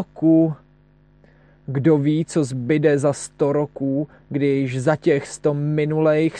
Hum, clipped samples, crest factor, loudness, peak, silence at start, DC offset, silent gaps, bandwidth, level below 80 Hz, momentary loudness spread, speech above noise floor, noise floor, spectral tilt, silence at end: none; under 0.1%; 16 dB; -20 LUFS; -4 dBFS; 0 s; under 0.1%; none; 10.5 kHz; -58 dBFS; 7 LU; 35 dB; -54 dBFS; -7.5 dB/octave; 0 s